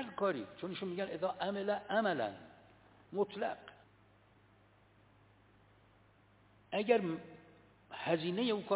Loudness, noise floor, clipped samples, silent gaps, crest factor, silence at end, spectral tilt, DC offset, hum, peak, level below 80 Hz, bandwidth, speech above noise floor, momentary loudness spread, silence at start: -37 LUFS; -67 dBFS; under 0.1%; none; 22 dB; 0 s; -4 dB/octave; under 0.1%; none; -16 dBFS; -76 dBFS; 4 kHz; 31 dB; 19 LU; 0 s